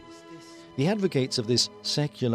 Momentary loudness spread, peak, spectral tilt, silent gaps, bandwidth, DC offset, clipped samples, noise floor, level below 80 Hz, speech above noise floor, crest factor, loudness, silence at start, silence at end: 21 LU; -10 dBFS; -4.5 dB/octave; none; 16 kHz; under 0.1%; under 0.1%; -46 dBFS; -66 dBFS; 20 dB; 16 dB; -26 LUFS; 0 s; 0 s